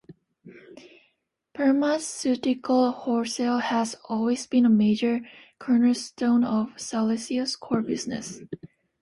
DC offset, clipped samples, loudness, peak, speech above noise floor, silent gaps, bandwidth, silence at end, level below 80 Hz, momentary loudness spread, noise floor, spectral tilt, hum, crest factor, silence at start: under 0.1%; under 0.1%; -25 LUFS; -10 dBFS; 49 dB; none; 11.5 kHz; 0.35 s; -66 dBFS; 11 LU; -73 dBFS; -5 dB/octave; none; 14 dB; 0.1 s